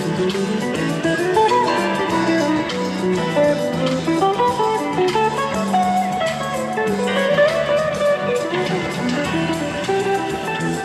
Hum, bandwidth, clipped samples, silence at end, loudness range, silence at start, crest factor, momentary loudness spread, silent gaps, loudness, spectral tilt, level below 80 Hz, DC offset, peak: none; 14.5 kHz; under 0.1%; 0 s; 1 LU; 0 s; 14 dB; 5 LU; none; -19 LUFS; -5 dB/octave; -50 dBFS; under 0.1%; -4 dBFS